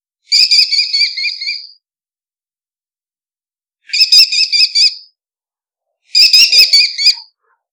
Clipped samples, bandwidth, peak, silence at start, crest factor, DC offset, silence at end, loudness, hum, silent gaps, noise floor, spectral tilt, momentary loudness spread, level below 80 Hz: 0.3%; over 20 kHz; 0 dBFS; 0.3 s; 14 dB; under 0.1%; 0.5 s; -7 LUFS; none; none; under -90 dBFS; 5.5 dB/octave; 13 LU; -62 dBFS